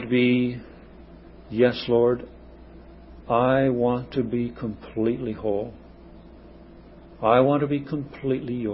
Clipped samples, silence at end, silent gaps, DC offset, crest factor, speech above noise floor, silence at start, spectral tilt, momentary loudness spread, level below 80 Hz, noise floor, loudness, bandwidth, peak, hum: under 0.1%; 0 s; none; under 0.1%; 20 dB; 23 dB; 0 s; -11.5 dB/octave; 12 LU; -50 dBFS; -46 dBFS; -24 LUFS; 5.8 kHz; -6 dBFS; none